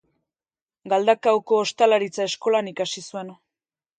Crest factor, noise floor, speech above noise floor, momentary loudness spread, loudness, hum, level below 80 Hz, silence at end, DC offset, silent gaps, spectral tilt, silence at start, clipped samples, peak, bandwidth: 20 dB; under -90 dBFS; over 69 dB; 14 LU; -22 LUFS; none; -76 dBFS; 0.65 s; under 0.1%; none; -3.5 dB/octave; 0.85 s; under 0.1%; -4 dBFS; 9.4 kHz